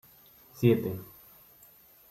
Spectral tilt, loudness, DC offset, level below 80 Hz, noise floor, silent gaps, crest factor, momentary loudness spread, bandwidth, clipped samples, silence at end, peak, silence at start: -8 dB/octave; -28 LUFS; under 0.1%; -66 dBFS; -57 dBFS; none; 22 dB; 26 LU; 16 kHz; under 0.1%; 1.05 s; -10 dBFS; 0.55 s